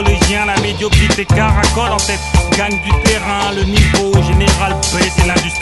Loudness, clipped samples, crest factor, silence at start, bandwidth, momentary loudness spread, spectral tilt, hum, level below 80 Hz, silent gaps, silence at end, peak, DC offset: -13 LUFS; under 0.1%; 12 dB; 0 s; 12 kHz; 3 LU; -4 dB/octave; none; -18 dBFS; none; 0 s; 0 dBFS; under 0.1%